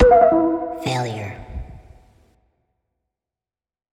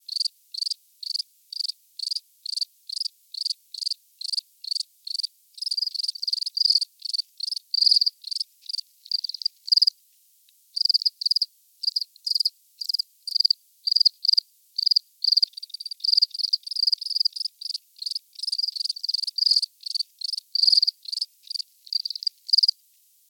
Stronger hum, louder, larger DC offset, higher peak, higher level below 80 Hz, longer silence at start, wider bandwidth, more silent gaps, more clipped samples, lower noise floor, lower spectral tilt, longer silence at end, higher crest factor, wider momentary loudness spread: neither; first, -19 LUFS vs -23 LUFS; neither; first, 0 dBFS vs -6 dBFS; first, -34 dBFS vs under -90 dBFS; about the same, 0 s vs 0.1 s; second, 13 kHz vs 18.5 kHz; neither; neither; first, under -90 dBFS vs -60 dBFS; first, -6.5 dB/octave vs 11.5 dB/octave; first, 2.15 s vs 0.6 s; about the same, 20 dB vs 22 dB; first, 23 LU vs 12 LU